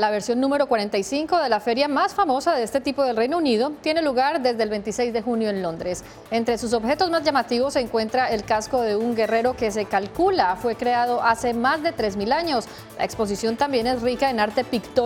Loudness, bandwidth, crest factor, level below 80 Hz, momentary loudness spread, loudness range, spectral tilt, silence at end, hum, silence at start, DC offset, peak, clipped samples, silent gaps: -22 LUFS; 17 kHz; 16 dB; -50 dBFS; 5 LU; 2 LU; -4 dB/octave; 0 s; none; 0 s; under 0.1%; -6 dBFS; under 0.1%; none